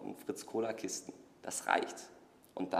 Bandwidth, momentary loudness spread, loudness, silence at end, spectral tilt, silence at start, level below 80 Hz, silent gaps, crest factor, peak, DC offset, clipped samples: 15.5 kHz; 17 LU; -38 LUFS; 0 s; -3 dB/octave; 0 s; -82 dBFS; none; 28 dB; -12 dBFS; under 0.1%; under 0.1%